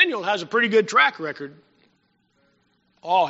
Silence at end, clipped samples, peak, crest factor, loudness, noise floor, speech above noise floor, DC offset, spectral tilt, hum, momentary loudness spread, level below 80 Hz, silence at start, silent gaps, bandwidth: 0 s; under 0.1%; -2 dBFS; 22 dB; -20 LUFS; -67 dBFS; 45 dB; under 0.1%; -1 dB/octave; none; 19 LU; -78 dBFS; 0 s; none; 8 kHz